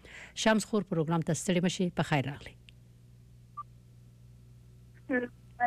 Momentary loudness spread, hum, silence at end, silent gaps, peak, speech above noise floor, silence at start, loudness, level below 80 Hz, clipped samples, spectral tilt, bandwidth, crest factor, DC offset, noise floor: 20 LU; 60 Hz at -55 dBFS; 0 s; none; -16 dBFS; 26 dB; 0.05 s; -31 LUFS; -60 dBFS; under 0.1%; -5 dB/octave; 14 kHz; 18 dB; under 0.1%; -56 dBFS